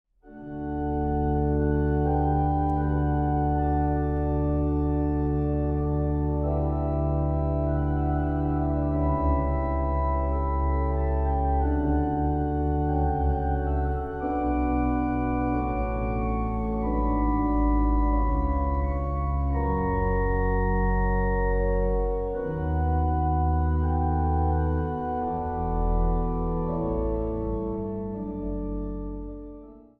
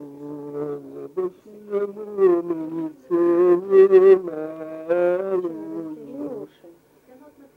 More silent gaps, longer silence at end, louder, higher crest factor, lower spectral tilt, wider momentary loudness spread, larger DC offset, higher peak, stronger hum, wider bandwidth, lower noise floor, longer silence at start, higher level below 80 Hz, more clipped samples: neither; second, 0.2 s vs 0.85 s; second, -26 LUFS vs -20 LUFS; second, 12 dB vs 18 dB; first, -12 dB/octave vs -9 dB/octave; second, 5 LU vs 19 LU; neither; second, -12 dBFS vs -4 dBFS; neither; second, 3.1 kHz vs 3.7 kHz; second, -45 dBFS vs -52 dBFS; first, 0.25 s vs 0 s; first, -28 dBFS vs -74 dBFS; neither